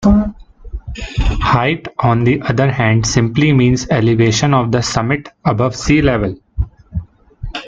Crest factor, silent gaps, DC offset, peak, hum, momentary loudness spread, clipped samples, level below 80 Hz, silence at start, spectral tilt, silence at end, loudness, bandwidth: 14 dB; none; under 0.1%; 0 dBFS; none; 15 LU; under 0.1%; -26 dBFS; 0 s; -6 dB/octave; 0 s; -15 LUFS; 7.8 kHz